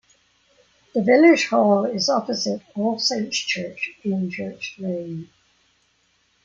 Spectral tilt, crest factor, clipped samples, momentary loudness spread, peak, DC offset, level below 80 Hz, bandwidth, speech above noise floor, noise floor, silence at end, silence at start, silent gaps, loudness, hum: -4.5 dB/octave; 18 dB; under 0.1%; 15 LU; -4 dBFS; under 0.1%; -68 dBFS; 7.6 kHz; 44 dB; -65 dBFS; 1.2 s; 0.95 s; none; -21 LUFS; none